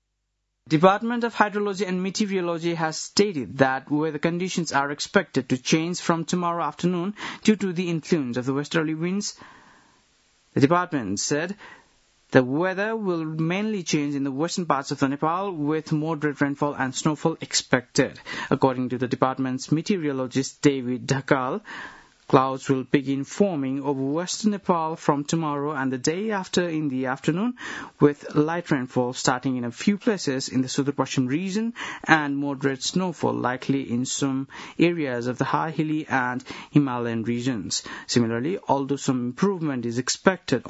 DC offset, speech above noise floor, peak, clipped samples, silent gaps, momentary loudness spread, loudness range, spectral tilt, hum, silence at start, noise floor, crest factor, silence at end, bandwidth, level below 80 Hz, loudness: under 0.1%; 52 dB; 0 dBFS; under 0.1%; none; 5 LU; 1 LU; -5 dB/octave; none; 0.65 s; -77 dBFS; 24 dB; 0 s; 8 kHz; -64 dBFS; -24 LUFS